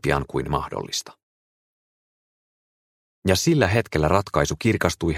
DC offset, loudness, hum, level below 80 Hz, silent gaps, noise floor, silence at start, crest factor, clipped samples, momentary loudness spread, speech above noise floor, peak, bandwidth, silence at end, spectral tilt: under 0.1%; -22 LUFS; none; -42 dBFS; 1.23-3.22 s; under -90 dBFS; 0.05 s; 24 dB; under 0.1%; 9 LU; over 68 dB; 0 dBFS; 16 kHz; 0 s; -5 dB/octave